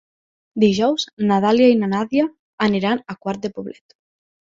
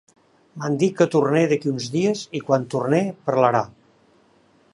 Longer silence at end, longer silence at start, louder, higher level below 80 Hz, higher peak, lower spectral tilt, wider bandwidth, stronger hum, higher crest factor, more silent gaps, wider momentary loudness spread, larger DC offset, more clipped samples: second, 0.8 s vs 1.05 s; about the same, 0.55 s vs 0.55 s; about the same, -19 LUFS vs -21 LUFS; first, -60 dBFS vs -66 dBFS; about the same, -2 dBFS vs -2 dBFS; about the same, -6 dB/octave vs -6.5 dB/octave; second, 7.6 kHz vs 11.5 kHz; neither; about the same, 16 dB vs 20 dB; first, 1.13-1.17 s, 2.39-2.58 s vs none; first, 14 LU vs 8 LU; neither; neither